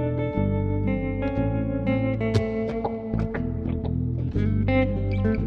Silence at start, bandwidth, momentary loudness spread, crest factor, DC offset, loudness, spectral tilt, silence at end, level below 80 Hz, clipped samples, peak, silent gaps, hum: 0 s; 6.6 kHz; 5 LU; 16 dB; under 0.1%; -26 LUFS; -9 dB/octave; 0 s; -34 dBFS; under 0.1%; -10 dBFS; none; none